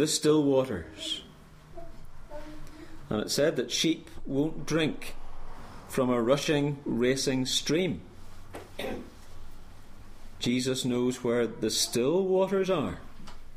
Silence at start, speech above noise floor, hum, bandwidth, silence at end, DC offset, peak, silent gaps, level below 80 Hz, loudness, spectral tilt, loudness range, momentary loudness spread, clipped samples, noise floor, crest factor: 0 s; 22 dB; none; 15.5 kHz; 0 s; under 0.1%; -12 dBFS; none; -46 dBFS; -28 LUFS; -4 dB/octave; 5 LU; 22 LU; under 0.1%; -50 dBFS; 18 dB